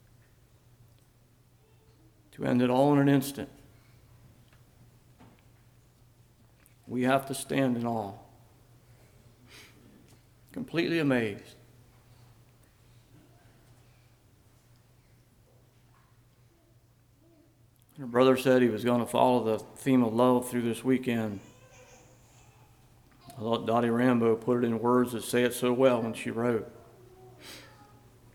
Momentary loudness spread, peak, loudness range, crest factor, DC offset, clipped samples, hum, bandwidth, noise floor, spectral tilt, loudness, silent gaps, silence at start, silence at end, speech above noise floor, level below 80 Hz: 20 LU; -8 dBFS; 9 LU; 22 dB; under 0.1%; under 0.1%; none; 18.5 kHz; -62 dBFS; -6 dB/octave; -27 LUFS; none; 2.4 s; 0.7 s; 36 dB; -66 dBFS